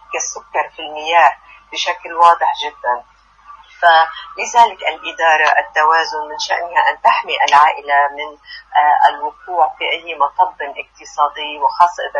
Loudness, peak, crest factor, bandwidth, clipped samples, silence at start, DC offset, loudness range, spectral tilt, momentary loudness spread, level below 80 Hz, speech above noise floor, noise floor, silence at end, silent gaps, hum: -15 LUFS; 0 dBFS; 16 dB; 9 kHz; under 0.1%; 0.1 s; under 0.1%; 3 LU; 0.5 dB/octave; 13 LU; -58 dBFS; 27 dB; -42 dBFS; 0 s; none; none